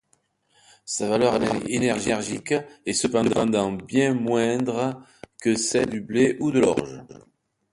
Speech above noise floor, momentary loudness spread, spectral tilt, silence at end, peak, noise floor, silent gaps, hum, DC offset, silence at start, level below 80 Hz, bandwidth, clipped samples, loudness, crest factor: 45 dB; 7 LU; -4.5 dB/octave; 0.55 s; -6 dBFS; -68 dBFS; none; none; under 0.1%; 0.85 s; -56 dBFS; 11.5 kHz; under 0.1%; -23 LUFS; 18 dB